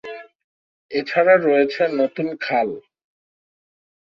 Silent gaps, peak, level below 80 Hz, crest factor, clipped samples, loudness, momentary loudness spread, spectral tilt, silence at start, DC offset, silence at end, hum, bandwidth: 0.35-0.89 s; -2 dBFS; -70 dBFS; 18 dB; under 0.1%; -19 LUFS; 19 LU; -7 dB/octave; 0.05 s; under 0.1%; 1.35 s; none; 6.4 kHz